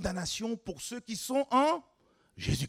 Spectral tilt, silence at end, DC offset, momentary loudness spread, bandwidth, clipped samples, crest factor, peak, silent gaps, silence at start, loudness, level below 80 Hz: -4.5 dB/octave; 0 s; under 0.1%; 12 LU; 16 kHz; under 0.1%; 18 dB; -14 dBFS; none; 0 s; -32 LUFS; -52 dBFS